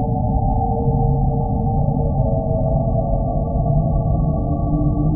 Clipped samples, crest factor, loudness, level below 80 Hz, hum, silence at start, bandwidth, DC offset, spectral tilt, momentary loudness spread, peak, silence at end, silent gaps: under 0.1%; 12 dB; -19 LUFS; -24 dBFS; none; 0 s; 1.3 kHz; under 0.1%; -20 dB/octave; 2 LU; -6 dBFS; 0 s; none